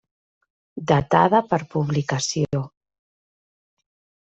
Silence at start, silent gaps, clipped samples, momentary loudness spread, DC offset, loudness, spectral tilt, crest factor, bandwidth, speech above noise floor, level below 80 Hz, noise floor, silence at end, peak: 0.75 s; none; under 0.1%; 15 LU; under 0.1%; -21 LUFS; -5.5 dB/octave; 22 dB; 8.2 kHz; over 70 dB; -54 dBFS; under -90 dBFS; 1.55 s; -2 dBFS